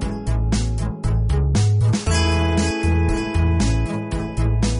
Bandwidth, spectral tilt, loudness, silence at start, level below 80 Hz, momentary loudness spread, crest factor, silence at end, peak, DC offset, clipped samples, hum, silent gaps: 11 kHz; -6 dB/octave; -20 LUFS; 0 s; -24 dBFS; 6 LU; 10 dB; 0 s; -8 dBFS; under 0.1%; under 0.1%; none; none